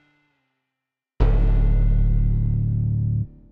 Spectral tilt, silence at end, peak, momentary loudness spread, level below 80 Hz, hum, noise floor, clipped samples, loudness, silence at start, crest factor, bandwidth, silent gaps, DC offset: -11 dB/octave; 0.25 s; -4 dBFS; 3 LU; -22 dBFS; none; -84 dBFS; under 0.1%; -22 LUFS; 1.2 s; 16 dB; 3.2 kHz; none; under 0.1%